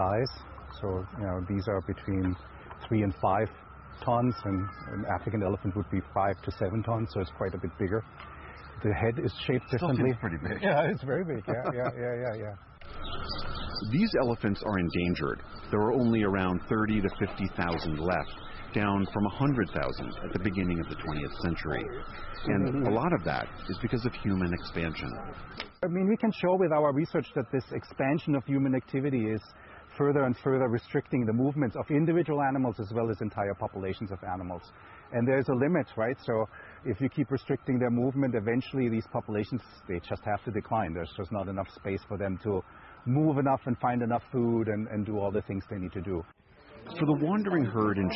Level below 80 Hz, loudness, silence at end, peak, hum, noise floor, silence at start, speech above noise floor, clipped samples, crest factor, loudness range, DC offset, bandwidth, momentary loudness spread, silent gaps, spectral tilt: -48 dBFS; -30 LUFS; 0 s; -14 dBFS; none; -52 dBFS; 0 s; 22 dB; under 0.1%; 16 dB; 4 LU; under 0.1%; 5.8 kHz; 11 LU; none; -11 dB/octave